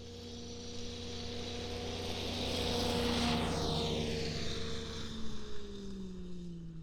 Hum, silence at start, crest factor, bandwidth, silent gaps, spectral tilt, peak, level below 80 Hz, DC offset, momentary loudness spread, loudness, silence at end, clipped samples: none; 0 s; 16 dB; 19 kHz; none; -4.5 dB/octave; -22 dBFS; -50 dBFS; under 0.1%; 13 LU; -38 LUFS; 0 s; under 0.1%